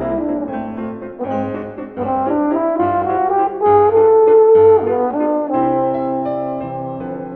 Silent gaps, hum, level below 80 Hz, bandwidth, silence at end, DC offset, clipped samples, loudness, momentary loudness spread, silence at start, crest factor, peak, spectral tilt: none; none; -50 dBFS; 3.5 kHz; 0 s; under 0.1%; under 0.1%; -15 LUFS; 15 LU; 0 s; 14 dB; -2 dBFS; -11 dB/octave